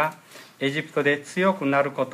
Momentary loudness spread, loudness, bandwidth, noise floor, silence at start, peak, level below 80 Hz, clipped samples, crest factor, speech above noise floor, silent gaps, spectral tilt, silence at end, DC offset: 6 LU; -24 LUFS; 15.5 kHz; -46 dBFS; 0 s; -8 dBFS; -74 dBFS; under 0.1%; 16 dB; 22 dB; none; -5.5 dB/octave; 0 s; under 0.1%